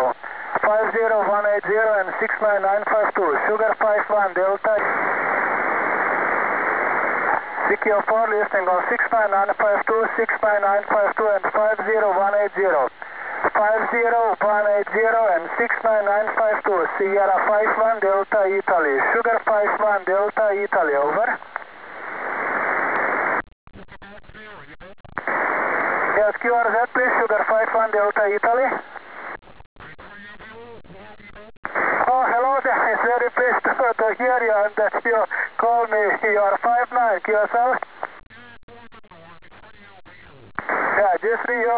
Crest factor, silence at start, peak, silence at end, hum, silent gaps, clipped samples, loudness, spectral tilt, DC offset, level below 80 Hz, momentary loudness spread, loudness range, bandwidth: 14 dB; 0 s; -6 dBFS; 0 s; none; 23.52-23.67 s, 25.00-25.04 s, 29.66-29.76 s, 31.57-31.63 s, 38.63-38.68 s; under 0.1%; -20 LUFS; -8 dB/octave; 0.3%; -60 dBFS; 9 LU; 6 LU; 4 kHz